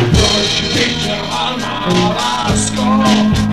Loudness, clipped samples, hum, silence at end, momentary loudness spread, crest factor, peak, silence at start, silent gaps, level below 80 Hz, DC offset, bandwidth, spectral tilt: -13 LUFS; under 0.1%; none; 0 s; 6 LU; 14 dB; 0 dBFS; 0 s; none; -28 dBFS; 1%; 13.5 kHz; -4 dB/octave